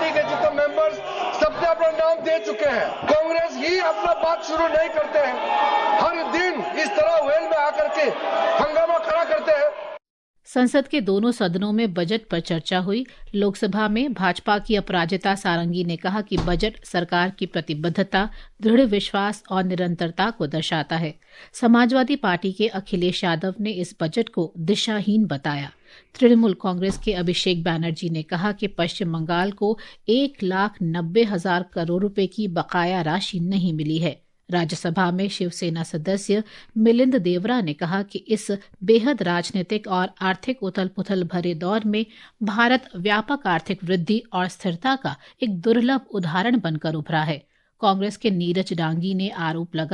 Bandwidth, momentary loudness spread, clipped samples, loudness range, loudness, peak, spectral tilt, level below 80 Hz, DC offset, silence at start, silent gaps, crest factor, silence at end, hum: 11.5 kHz; 7 LU; under 0.1%; 3 LU; -22 LUFS; -4 dBFS; -6 dB/octave; -46 dBFS; under 0.1%; 0 s; 10.10-10.34 s; 18 dB; 0 s; none